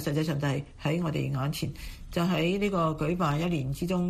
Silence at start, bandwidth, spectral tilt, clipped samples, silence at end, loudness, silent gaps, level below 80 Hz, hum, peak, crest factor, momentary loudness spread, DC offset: 0 s; 15 kHz; -6.5 dB/octave; under 0.1%; 0 s; -29 LUFS; none; -46 dBFS; none; -14 dBFS; 14 dB; 6 LU; under 0.1%